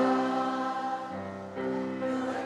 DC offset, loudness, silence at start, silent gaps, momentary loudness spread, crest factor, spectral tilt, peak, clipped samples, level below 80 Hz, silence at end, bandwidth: under 0.1%; -32 LUFS; 0 s; none; 10 LU; 16 dB; -6 dB/octave; -14 dBFS; under 0.1%; -72 dBFS; 0 s; 11 kHz